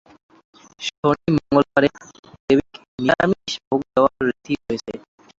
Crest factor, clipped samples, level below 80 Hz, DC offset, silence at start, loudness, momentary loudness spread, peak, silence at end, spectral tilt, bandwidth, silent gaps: 20 dB; under 0.1%; -50 dBFS; under 0.1%; 0.8 s; -21 LUFS; 11 LU; -2 dBFS; 0.4 s; -6 dB/octave; 7.8 kHz; 0.98-1.03 s, 2.19-2.23 s, 2.40-2.48 s, 2.88-2.98 s, 3.67-3.71 s